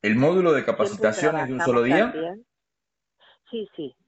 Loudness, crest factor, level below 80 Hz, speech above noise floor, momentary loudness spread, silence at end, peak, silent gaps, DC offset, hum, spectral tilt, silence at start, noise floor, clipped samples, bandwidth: -22 LUFS; 18 dB; -62 dBFS; 63 dB; 15 LU; 0.15 s; -6 dBFS; none; under 0.1%; none; -6 dB/octave; 0.05 s; -86 dBFS; under 0.1%; 8.8 kHz